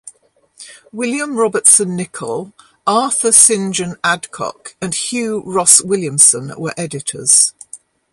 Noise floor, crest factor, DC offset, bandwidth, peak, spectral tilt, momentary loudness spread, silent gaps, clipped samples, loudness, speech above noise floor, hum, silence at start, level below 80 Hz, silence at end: -53 dBFS; 16 dB; under 0.1%; 16 kHz; 0 dBFS; -2 dB/octave; 16 LU; none; 0.2%; -12 LUFS; 38 dB; none; 0.05 s; -60 dBFS; 0.35 s